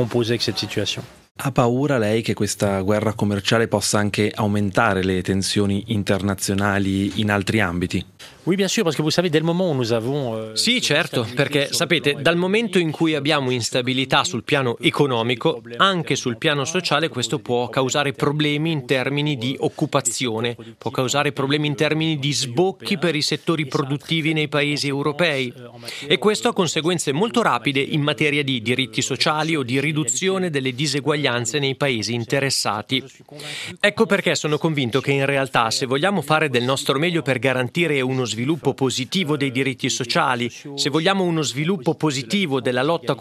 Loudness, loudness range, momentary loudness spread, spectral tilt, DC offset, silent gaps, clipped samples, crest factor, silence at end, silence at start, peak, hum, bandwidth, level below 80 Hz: -20 LUFS; 2 LU; 5 LU; -4.5 dB/octave; under 0.1%; 1.31-1.35 s; under 0.1%; 18 dB; 0 s; 0 s; -2 dBFS; none; 15 kHz; -60 dBFS